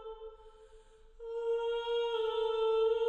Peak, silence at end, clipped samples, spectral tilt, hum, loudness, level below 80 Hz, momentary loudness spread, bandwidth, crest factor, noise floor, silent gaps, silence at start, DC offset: -22 dBFS; 0 s; under 0.1%; -2.5 dB/octave; none; -33 LUFS; -60 dBFS; 19 LU; 7.8 kHz; 12 dB; -58 dBFS; none; 0 s; under 0.1%